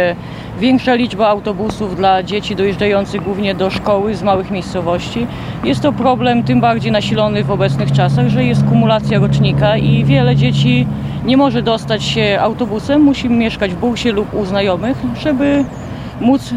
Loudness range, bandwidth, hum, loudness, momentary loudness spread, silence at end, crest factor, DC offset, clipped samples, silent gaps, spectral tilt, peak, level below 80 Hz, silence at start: 4 LU; 10.5 kHz; none; -14 LUFS; 7 LU; 0 s; 14 dB; under 0.1%; under 0.1%; none; -7 dB/octave; 0 dBFS; -36 dBFS; 0 s